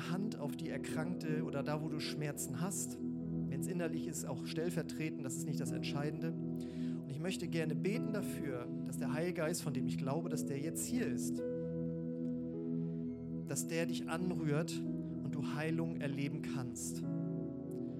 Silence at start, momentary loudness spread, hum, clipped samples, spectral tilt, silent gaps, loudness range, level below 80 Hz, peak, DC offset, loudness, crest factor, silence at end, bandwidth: 0 s; 4 LU; none; under 0.1%; -5.5 dB/octave; none; 1 LU; -72 dBFS; -24 dBFS; under 0.1%; -39 LUFS; 16 dB; 0 s; 16 kHz